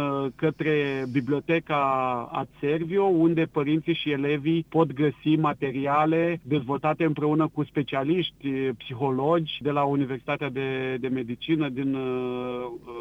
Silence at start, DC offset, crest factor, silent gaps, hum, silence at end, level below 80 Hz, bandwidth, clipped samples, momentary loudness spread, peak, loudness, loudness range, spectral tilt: 0 s; under 0.1%; 16 dB; none; none; 0 s; -60 dBFS; 6 kHz; under 0.1%; 6 LU; -8 dBFS; -26 LUFS; 3 LU; -8.5 dB/octave